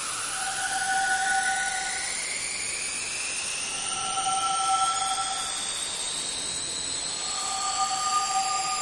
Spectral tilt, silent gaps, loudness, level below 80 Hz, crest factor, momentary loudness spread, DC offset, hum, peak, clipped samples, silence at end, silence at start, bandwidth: 1 dB/octave; none; -26 LUFS; -60 dBFS; 16 dB; 4 LU; under 0.1%; none; -12 dBFS; under 0.1%; 0 s; 0 s; 11.5 kHz